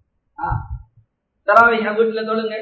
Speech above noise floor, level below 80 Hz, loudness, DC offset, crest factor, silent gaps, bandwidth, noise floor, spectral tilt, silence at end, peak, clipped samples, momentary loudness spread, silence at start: 42 dB; -38 dBFS; -17 LUFS; under 0.1%; 18 dB; none; 8 kHz; -58 dBFS; -7 dB/octave; 0 s; 0 dBFS; under 0.1%; 18 LU; 0.4 s